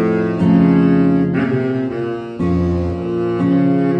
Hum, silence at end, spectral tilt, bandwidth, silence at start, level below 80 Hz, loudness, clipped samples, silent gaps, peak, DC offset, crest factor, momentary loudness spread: none; 0 s; -10 dB/octave; 5.6 kHz; 0 s; -38 dBFS; -16 LUFS; under 0.1%; none; -2 dBFS; under 0.1%; 14 dB; 9 LU